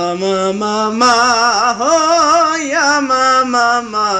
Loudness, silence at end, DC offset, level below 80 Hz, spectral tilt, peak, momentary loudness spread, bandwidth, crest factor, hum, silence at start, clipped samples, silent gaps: -12 LUFS; 0 s; under 0.1%; -54 dBFS; -2.5 dB/octave; -2 dBFS; 6 LU; 10.5 kHz; 12 dB; none; 0 s; under 0.1%; none